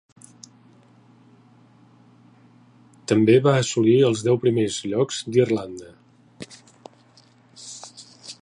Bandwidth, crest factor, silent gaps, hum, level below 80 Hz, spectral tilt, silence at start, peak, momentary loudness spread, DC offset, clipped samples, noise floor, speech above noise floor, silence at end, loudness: 11 kHz; 20 dB; none; none; -64 dBFS; -6 dB/octave; 3.1 s; -4 dBFS; 24 LU; under 0.1%; under 0.1%; -55 dBFS; 35 dB; 0.1 s; -20 LUFS